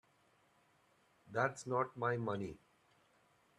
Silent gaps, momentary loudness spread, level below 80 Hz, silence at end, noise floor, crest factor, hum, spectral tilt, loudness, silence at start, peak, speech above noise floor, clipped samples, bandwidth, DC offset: none; 7 LU; -76 dBFS; 1 s; -73 dBFS; 22 dB; none; -6 dB/octave; -39 LUFS; 1.25 s; -20 dBFS; 35 dB; under 0.1%; 12 kHz; under 0.1%